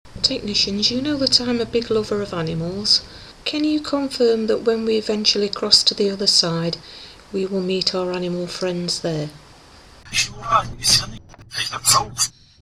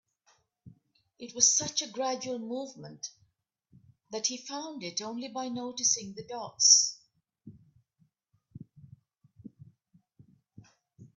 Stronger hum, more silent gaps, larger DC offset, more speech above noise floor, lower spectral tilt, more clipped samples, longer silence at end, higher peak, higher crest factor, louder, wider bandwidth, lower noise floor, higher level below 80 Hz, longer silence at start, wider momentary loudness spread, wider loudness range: neither; neither; neither; second, 25 dB vs 43 dB; first, -3 dB/octave vs -0.5 dB/octave; neither; first, 0.35 s vs 0.1 s; first, 0 dBFS vs -6 dBFS; second, 22 dB vs 28 dB; first, -19 LUFS vs -27 LUFS; first, 15.5 kHz vs 10.5 kHz; second, -46 dBFS vs -74 dBFS; first, -46 dBFS vs -78 dBFS; second, 0.05 s vs 0.65 s; second, 11 LU vs 22 LU; second, 6 LU vs 10 LU